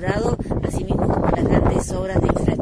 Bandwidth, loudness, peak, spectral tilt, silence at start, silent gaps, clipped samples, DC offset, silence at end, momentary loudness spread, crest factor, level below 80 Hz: 11 kHz; -20 LUFS; -6 dBFS; -7.5 dB/octave; 0 s; none; under 0.1%; under 0.1%; 0 s; 6 LU; 14 dB; -28 dBFS